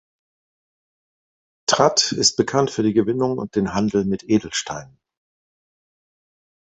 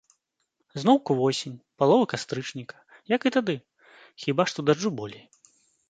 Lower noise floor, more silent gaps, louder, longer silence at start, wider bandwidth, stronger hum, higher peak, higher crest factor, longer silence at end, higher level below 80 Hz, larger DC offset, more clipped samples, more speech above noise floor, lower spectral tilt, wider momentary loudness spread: first, under -90 dBFS vs -77 dBFS; neither; first, -20 LUFS vs -25 LUFS; first, 1.7 s vs 0.75 s; about the same, 8.4 kHz vs 9.2 kHz; neither; first, -2 dBFS vs -6 dBFS; about the same, 22 dB vs 20 dB; first, 1.8 s vs 0.7 s; first, -54 dBFS vs -70 dBFS; neither; neither; first, over 70 dB vs 52 dB; second, -3.5 dB/octave vs -5.5 dB/octave; second, 10 LU vs 17 LU